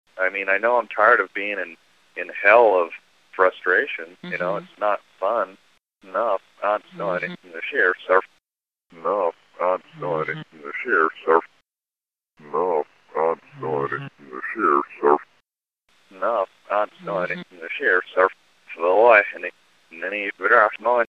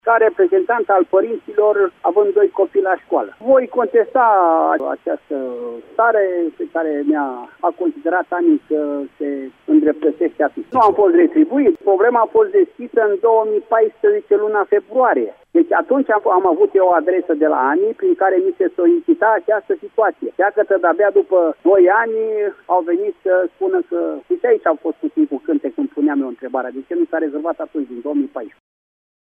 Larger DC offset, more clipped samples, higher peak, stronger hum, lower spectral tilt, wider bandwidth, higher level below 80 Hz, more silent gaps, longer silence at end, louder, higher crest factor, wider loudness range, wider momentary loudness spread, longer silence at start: neither; neither; first, 0 dBFS vs -4 dBFS; neither; second, -6.5 dB/octave vs -8 dB/octave; first, 6.8 kHz vs 3.6 kHz; second, -72 dBFS vs -66 dBFS; neither; second, 0.05 s vs 0.8 s; second, -21 LUFS vs -16 LUFS; first, 22 dB vs 12 dB; about the same, 6 LU vs 5 LU; first, 15 LU vs 9 LU; about the same, 0.15 s vs 0.05 s